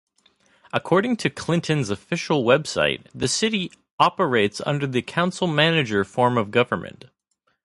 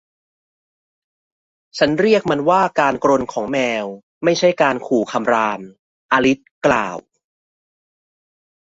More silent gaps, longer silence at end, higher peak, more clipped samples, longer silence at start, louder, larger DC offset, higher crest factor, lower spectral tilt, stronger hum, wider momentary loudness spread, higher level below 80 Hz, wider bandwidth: second, 3.91-3.98 s vs 4.03-4.21 s, 5.79-6.09 s, 6.51-6.61 s; second, 0.75 s vs 1.6 s; about the same, -2 dBFS vs -2 dBFS; neither; second, 0.75 s vs 1.75 s; second, -22 LUFS vs -17 LUFS; neither; about the same, 20 dB vs 18 dB; about the same, -4.5 dB/octave vs -5 dB/octave; neither; about the same, 8 LU vs 9 LU; about the same, -56 dBFS vs -56 dBFS; first, 11.5 kHz vs 8 kHz